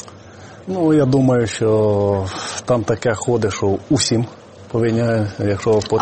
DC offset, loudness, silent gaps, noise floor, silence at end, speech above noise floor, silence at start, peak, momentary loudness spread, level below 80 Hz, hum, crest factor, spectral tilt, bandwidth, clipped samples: under 0.1%; -18 LUFS; none; -39 dBFS; 0 s; 22 dB; 0 s; -4 dBFS; 10 LU; -48 dBFS; none; 14 dB; -6 dB/octave; 8.8 kHz; under 0.1%